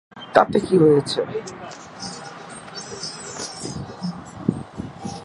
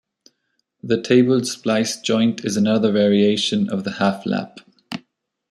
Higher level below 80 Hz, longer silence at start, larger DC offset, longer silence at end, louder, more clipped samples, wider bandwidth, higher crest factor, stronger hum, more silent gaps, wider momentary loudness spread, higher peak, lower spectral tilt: first, -52 dBFS vs -64 dBFS; second, 0.15 s vs 0.85 s; neither; second, 0 s vs 0.55 s; second, -22 LUFS vs -19 LUFS; neither; second, 11.5 kHz vs 13.5 kHz; first, 22 dB vs 16 dB; neither; neither; about the same, 19 LU vs 18 LU; first, 0 dBFS vs -4 dBFS; about the same, -5.5 dB/octave vs -5 dB/octave